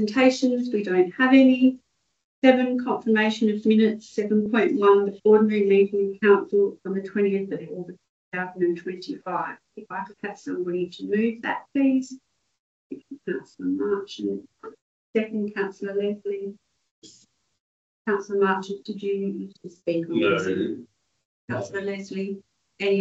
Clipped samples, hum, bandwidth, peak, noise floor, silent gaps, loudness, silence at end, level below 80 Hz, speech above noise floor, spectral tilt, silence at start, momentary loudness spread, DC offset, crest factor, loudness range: under 0.1%; none; 7.8 kHz; -4 dBFS; -60 dBFS; 2.24-2.42 s, 8.09-8.32 s, 12.59-12.90 s, 14.82-15.13 s, 16.91-17.02 s, 17.60-18.05 s, 21.25-21.48 s; -23 LUFS; 0 s; -72 dBFS; 37 dB; -6.5 dB/octave; 0 s; 16 LU; under 0.1%; 20 dB; 10 LU